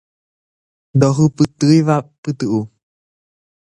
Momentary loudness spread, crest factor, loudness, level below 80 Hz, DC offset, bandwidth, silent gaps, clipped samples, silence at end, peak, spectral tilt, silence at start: 10 LU; 16 dB; -16 LUFS; -54 dBFS; under 0.1%; 11 kHz; 2.18-2.23 s; under 0.1%; 0.95 s; 0 dBFS; -7 dB/octave; 0.95 s